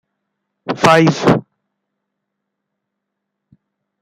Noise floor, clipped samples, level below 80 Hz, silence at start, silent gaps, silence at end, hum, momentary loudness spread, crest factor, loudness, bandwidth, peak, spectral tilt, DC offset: -77 dBFS; under 0.1%; -52 dBFS; 0.65 s; none; 2.6 s; none; 15 LU; 18 dB; -13 LUFS; 15 kHz; 0 dBFS; -5.5 dB/octave; under 0.1%